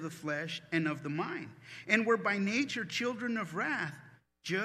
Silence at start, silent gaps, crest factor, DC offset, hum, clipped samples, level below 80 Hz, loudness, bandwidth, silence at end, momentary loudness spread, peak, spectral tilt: 0 s; none; 24 dB; under 0.1%; none; under 0.1%; -78 dBFS; -33 LUFS; 14 kHz; 0 s; 13 LU; -12 dBFS; -5 dB/octave